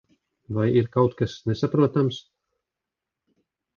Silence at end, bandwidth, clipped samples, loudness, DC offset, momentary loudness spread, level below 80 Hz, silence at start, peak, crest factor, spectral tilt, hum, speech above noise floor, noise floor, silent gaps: 1.55 s; 7 kHz; under 0.1%; -23 LUFS; under 0.1%; 8 LU; -56 dBFS; 0.5 s; -6 dBFS; 20 dB; -8 dB/octave; none; 64 dB; -86 dBFS; none